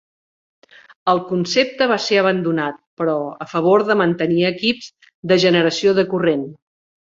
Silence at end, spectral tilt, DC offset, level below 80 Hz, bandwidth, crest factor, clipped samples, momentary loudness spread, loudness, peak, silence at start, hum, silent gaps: 0.55 s; -5 dB/octave; under 0.1%; -62 dBFS; 7.6 kHz; 16 dB; under 0.1%; 9 LU; -18 LUFS; -2 dBFS; 1.05 s; none; 2.87-2.97 s, 5.14-5.23 s